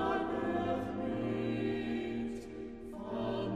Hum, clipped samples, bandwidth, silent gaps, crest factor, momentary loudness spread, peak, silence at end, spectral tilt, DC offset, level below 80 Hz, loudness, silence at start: none; under 0.1%; 12 kHz; none; 14 dB; 11 LU; -22 dBFS; 0 s; -7.5 dB/octave; under 0.1%; -56 dBFS; -37 LUFS; 0 s